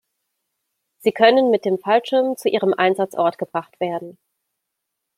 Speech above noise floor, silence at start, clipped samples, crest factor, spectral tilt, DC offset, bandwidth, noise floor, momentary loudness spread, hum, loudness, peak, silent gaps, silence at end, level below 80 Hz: 61 dB; 1.05 s; under 0.1%; 18 dB; -5.5 dB/octave; under 0.1%; 15.5 kHz; -79 dBFS; 11 LU; none; -19 LUFS; -2 dBFS; none; 1.05 s; -72 dBFS